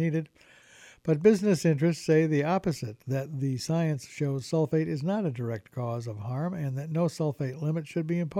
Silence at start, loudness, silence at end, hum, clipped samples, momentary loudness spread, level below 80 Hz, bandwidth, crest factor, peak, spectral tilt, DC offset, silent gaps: 0 s; -29 LUFS; 0 s; none; under 0.1%; 10 LU; -64 dBFS; 13.5 kHz; 20 dB; -8 dBFS; -7 dB/octave; under 0.1%; none